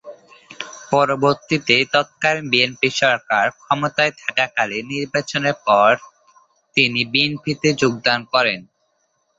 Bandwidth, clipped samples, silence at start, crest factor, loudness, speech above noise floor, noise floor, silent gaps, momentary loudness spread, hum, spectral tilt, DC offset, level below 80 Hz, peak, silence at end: 8 kHz; under 0.1%; 0.05 s; 18 dB; -18 LUFS; 48 dB; -67 dBFS; none; 7 LU; none; -4 dB/octave; under 0.1%; -60 dBFS; -2 dBFS; 0.75 s